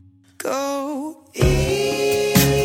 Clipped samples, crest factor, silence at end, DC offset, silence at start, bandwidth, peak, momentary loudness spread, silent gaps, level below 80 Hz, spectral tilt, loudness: under 0.1%; 20 dB; 0 s; under 0.1%; 0.4 s; 17.5 kHz; -2 dBFS; 14 LU; none; -32 dBFS; -5 dB/octave; -20 LUFS